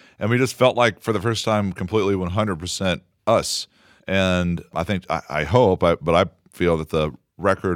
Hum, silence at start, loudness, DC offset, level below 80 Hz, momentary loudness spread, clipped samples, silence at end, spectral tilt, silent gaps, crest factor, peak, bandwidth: none; 0.2 s; -21 LUFS; under 0.1%; -44 dBFS; 8 LU; under 0.1%; 0 s; -5.5 dB/octave; none; 20 dB; -2 dBFS; 17 kHz